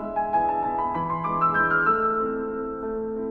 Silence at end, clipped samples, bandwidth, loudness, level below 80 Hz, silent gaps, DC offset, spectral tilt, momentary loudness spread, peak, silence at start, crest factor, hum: 0 s; under 0.1%; 5.8 kHz; -24 LUFS; -50 dBFS; none; under 0.1%; -9 dB/octave; 10 LU; -10 dBFS; 0 s; 14 dB; none